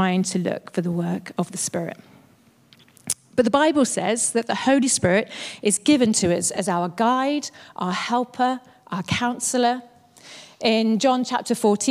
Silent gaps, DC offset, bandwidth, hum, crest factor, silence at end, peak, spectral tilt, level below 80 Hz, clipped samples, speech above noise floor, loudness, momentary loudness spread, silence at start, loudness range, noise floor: none; under 0.1%; 15.5 kHz; none; 18 dB; 0 s; -4 dBFS; -4 dB/octave; -62 dBFS; under 0.1%; 34 dB; -22 LUFS; 12 LU; 0 s; 5 LU; -56 dBFS